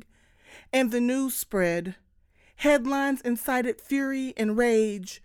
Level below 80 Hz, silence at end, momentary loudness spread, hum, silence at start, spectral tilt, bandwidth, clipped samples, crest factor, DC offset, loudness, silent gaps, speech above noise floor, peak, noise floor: -56 dBFS; 0.05 s; 6 LU; none; 0.5 s; -4.5 dB/octave; 19.5 kHz; under 0.1%; 16 dB; under 0.1%; -26 LUFS; none; 36 dB; -10 dBFS; -61 dBFS